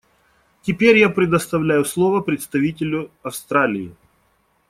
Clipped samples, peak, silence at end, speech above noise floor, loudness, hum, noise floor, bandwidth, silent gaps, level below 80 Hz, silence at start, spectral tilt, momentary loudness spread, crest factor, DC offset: under 0.1%; -2 dBFS; 0.8 s; 44 dB; -18 LUFS; none; -63 dBFS; 16 kHz; none; -54 dBFS; 0.65 s; -5.5 dB/octave; 15 LU; 18 dB; under 0.1%